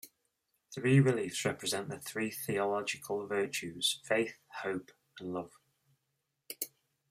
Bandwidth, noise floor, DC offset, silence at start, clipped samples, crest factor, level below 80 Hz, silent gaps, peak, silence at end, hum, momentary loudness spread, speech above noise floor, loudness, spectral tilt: 16 kHz; -83 dBFS; under 0.1%; 0.05 s; under 0.1%; 20 dB; -76 dBFS; none; -14 dBFS; 0.45 s; none; 14 LU; 50 dB; -34 LUFS; -4.5 dB/octave